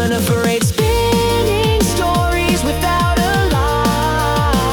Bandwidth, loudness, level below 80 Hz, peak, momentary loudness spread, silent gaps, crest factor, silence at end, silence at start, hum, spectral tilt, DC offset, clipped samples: over 20 kHz; -15 LUFS; -24 dBFS; -4 dBFS; 1 LU; none; 10 dB; 0 s; 0 s; none; -5 dB/octave; under 0.1%; under 0.1%